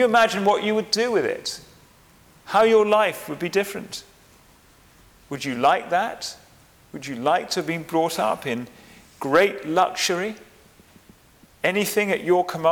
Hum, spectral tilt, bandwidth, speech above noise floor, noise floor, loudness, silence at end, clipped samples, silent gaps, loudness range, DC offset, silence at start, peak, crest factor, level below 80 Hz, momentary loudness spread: none; -3.5 dB/octave; 19.5 kHz; 32 dB; -54 dBFS; -22 LUFS; 0 s; under 0.1%; none; 5 LU; under 0.1%; 0 s; -6 dBFS; 18 dB; -62 dBFS; 16 LU